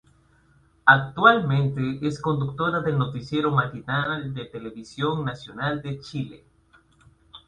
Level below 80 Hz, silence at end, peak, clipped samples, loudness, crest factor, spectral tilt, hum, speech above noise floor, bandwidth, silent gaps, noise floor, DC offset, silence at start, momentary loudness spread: -56 dBFS; 0.1 s; 0 dBFS; under 0.1%; -23 LUFS; 24 dB; -7 dB/octave; none; 36 dB; 9.2 kHz; none; -60 dBFS; under 0.1%; 0.85 s; 16 LU